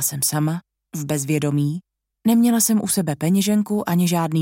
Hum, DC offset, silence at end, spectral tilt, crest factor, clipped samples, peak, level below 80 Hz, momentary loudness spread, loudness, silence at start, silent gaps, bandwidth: none; under 0.1%; 0 s; -5 dB/octave; 14 dB; under 0.1%; -6 dBFS; -62 dBFS; 9 LU; -20 LUFS; 0 s; none; 17 kHz